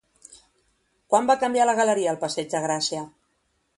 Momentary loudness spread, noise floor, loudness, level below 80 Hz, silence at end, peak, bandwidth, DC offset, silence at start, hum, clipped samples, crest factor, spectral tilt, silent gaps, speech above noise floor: 8 LU; -71 dBFS; -23 LUFS; -68 dBFS; 0.7 s; -6 dBFS; 11.5 kHz; under 0.1%; 0.3 s; none; under 0.1%; 20 dB; -3 dB/octave; none; 48 dB